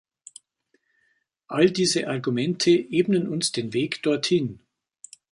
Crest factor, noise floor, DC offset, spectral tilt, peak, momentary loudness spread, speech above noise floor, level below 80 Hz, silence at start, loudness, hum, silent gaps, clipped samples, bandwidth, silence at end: 18 dB; -70 dBFS; under 0.1%; -4.5 dB/octave; -6 dBFS; 6 LU; 48 dB; -66 dBFS; 1.5 s; -23 LUFS; none; none; under 0.1%; 11.5 kHz; 0.75 s